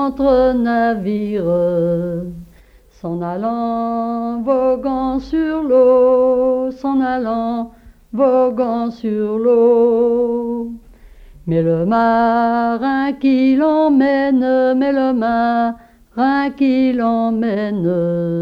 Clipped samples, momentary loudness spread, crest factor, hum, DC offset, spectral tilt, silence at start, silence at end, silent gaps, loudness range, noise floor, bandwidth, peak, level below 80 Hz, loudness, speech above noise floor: under 0.1%; 9 LU; 12 dB; none; under 0.1%; -9 dB/octave; 0 s; 0 s; none; 5 LU; -47 dBFS; 5.6 kHz; -2 dBFS; -44 dBFS; -16 LUFS; 31 dB